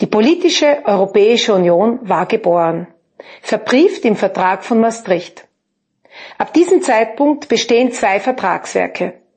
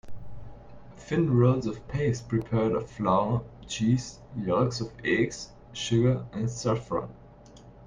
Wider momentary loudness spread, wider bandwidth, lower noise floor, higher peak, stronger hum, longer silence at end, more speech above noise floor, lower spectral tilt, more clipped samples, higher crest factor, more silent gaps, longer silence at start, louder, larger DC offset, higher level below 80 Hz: second, 8 LU vs 16 LU; about the same, 8.8 kHz vs 9.6 kHz; first, -70 dBFS vs -50 dBFS; first, 0 dBFS vs -10 dBFS; neither; first, 0.25 s vs 0 s; first, 56 dB vs 24 dB; second, -4.5 dB/octave vs -6.5 dB/octave; neither; about the same, 14 dB vs 18 dB; neither; about the same, 0 s vs 0.05 s; first, -14 LUFS vs -28 LUFS; neither; second, -64 dBFS vs -52 dBFS